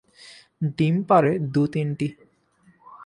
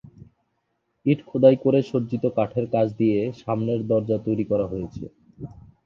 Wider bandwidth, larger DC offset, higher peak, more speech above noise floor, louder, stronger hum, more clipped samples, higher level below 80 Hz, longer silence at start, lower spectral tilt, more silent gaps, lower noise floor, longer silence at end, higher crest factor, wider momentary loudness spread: first, 10.5 kHz vs 6.8 kHz; neither; about the same, -4 dBFS vs -2 dBFS; second, 38 dB vs 52 dB; about the same, -23 LUFS vs -23 LUFS; neither; neither; second, -62 dBFS vs -54 dBFS; second, 0.25 s vs 1.05 s; about the same, -8.5 dB/octave vs -9.5 dB/octave; neither; second, -60 dBFS vs -74 dBFS; second, 0 s vs 0.25 s; about the same, 20 dB vs 20 dB; second, 11 LU vs 22 LU